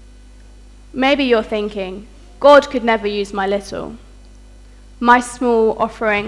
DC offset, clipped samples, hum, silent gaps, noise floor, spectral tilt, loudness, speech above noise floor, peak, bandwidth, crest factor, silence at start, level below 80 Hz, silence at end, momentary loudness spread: under 0.1%; under 0.1%; 50 Hz at -40 dBFS; none; -41 dBFS; -4.5 dB/octave; -15 LUFS; 26 dB; 0 dBFS; 12 kHz; 16 dB; 0.95 s; -42 dBFS; 0 s; 18 LU